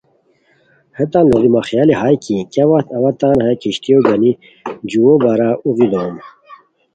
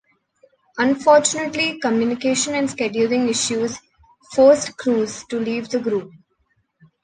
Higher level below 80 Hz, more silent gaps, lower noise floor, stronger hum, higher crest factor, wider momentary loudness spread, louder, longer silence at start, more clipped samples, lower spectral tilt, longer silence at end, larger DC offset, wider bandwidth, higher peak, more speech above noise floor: first, -50 dBFS vs -60 dBFS; neither; second, -56 dBFS vs -67 dBFS; neither; about the same, 14 dB vs 18 dB; about the same, 10 LU vs 11 LU; first, -13 LUFS vs -19 LUFS; first, 1 s vs 0.75 s; neither; first, -7.5 dB/octave vs -3 dB/octave; second, 0.4 s vs 0.95 s; neither; second, 9 kHz vs 10 kHz; about the same, 0 dBFS vs -2 dBFS; second, 43 dB vs 48 dB